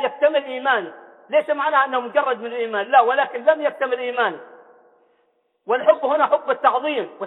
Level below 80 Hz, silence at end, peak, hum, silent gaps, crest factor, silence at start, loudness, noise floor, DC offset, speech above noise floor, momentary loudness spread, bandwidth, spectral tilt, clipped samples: -84 dBFS; 0 s; -2 dBFS; none; none; 18 dB; 0 s; -20 LUFS; -66 dBFS; under 0.1%; 46 dB; 7 LU; 4.1 kHz; -5.5 dB/octave; under 0.1%